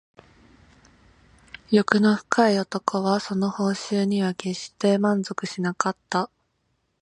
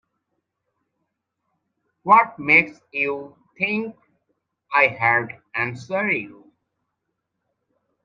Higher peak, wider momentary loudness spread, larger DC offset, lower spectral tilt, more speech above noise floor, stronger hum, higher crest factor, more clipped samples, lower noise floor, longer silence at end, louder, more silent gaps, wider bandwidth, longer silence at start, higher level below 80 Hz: about the same, 0 dBFS vs 0 dBFS; second, 8 LU vs 14 LU; neither; about the same, -5.5 dB/octave vs -6 dB/octave; second, 49 dB vs 58 dB; neither; about the same, 24 dB vs 24 dB; neither; second, -72 dBFS vs -78 dBFS; second, 0.75 s vs 1.75 s; second, -23 LUFS vs -20 LUFS; neither; first, 10.5 kHz vs 7.6 kHz; second, 1.7 s vs 2.05 s; about the same, -64 dBFS vs -68 dBFS